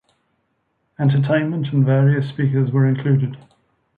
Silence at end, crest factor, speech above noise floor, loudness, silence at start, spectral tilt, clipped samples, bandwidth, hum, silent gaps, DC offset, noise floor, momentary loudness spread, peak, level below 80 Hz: 0.6 s; 14 dB; 52 dB; -18 LUFS; 1 s; -11 dB/octave; under 0.1%; 4.4 kHz; none; none; under 0.1%; -69 dBFS; 5 LU; -6 dBFS; -60 dBFS